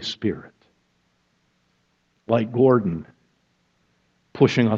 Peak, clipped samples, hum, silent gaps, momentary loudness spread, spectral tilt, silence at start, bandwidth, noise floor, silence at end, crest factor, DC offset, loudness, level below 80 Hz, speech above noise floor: -2 dBFS; under 0.1%; none; none; 17 LU; -7 dB/octave; 0 s; 7.6 kHz; -68 dBFS; 0 s; 22 dB; under 0.1%; -21 LUFS; -60 dBFS; 48 dB